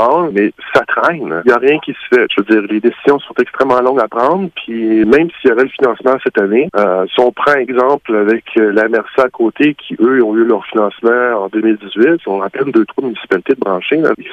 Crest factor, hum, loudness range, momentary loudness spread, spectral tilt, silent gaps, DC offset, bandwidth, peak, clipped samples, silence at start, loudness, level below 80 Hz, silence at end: 12 dB; none; 1 LU; 4 LU; -7 dB/octave; none; under 0.1%; 7.6 kHz; 0 dBFS; under 0.1%; 0 s; -13 LUFS; -54 dBFS; 0 s